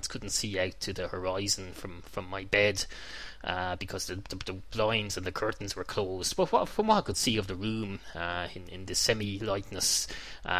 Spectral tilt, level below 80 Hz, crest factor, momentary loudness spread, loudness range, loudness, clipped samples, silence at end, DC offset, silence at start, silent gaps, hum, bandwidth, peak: -3 dB/octave; -50 dBFS; 22 dB; 12 LU; 3 LU; -31 LUFS; under 0.1%; 0 s; 0.4%; 0 s; none; none; 16 kHz; -8 dBFS